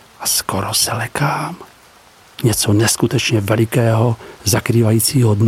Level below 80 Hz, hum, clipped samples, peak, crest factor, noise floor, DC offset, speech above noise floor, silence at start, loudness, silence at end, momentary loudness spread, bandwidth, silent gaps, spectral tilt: -46 dBFS; none; under 0.1%; 0 dBFS; 16 dB; -46 dBFS; under 0.1%; 31 dB; 0.2 s; -16 LUFS; 0 s; 6 LU; 17 kHz; none; -4.5 dB/octave